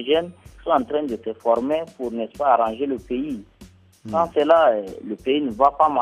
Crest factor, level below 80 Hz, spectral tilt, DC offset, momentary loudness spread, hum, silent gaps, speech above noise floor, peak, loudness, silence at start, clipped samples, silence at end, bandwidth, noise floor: 18 dB; -52 dBFS; -6 dB/octave; under 0.1%; 13 LU; none; none; 28 dB; -2 dBFS; -21 LUFS; 0 s; under 0.1%; 0 s; 12 kHz; -48 dBFS